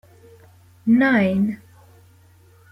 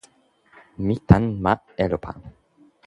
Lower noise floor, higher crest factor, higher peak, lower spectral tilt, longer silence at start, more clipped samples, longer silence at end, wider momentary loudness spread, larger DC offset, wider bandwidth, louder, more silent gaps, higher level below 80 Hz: second, -52 dBFS vs -59 dBFS; second, 16 dB vs 22 dB; second, -6 dBFS vs 0 dBFS; about the same, -8 dB/octave vs -9 dB/octave; about the same, 0.85 s vs 0.8 s; neither; first, 1.15 s vs 0.55 s; about the same, 13 LU vs 15 LU; neither; second, 5.8 kHz vs 10.5 kHz; first, -19 LUFS vs -22 LUFS; neither; second, -62 dBFS vs -38 dBFS